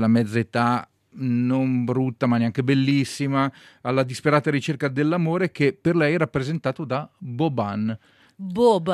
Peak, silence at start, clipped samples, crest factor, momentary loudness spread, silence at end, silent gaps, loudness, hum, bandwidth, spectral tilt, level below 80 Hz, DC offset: -6 dBFS; 0 s; under 0.1%; 18 dB; 8 LU; 0 s; none; -23 LUFS; none; 13 kHz; -7 dB/octave; -60 dBFS; under 0.1%